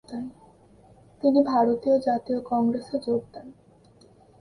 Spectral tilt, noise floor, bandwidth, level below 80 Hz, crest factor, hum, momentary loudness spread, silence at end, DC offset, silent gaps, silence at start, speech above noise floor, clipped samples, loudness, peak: -7.5 dB/octave; -55 dBFS; 10.5 kHz; -64 dBFS; 18 dB; none; 17 LU; 0.9 s; under 0.1%; none; 0.1 s; 32 dB; under 0.1%; -24 LUFS; -8 dBFS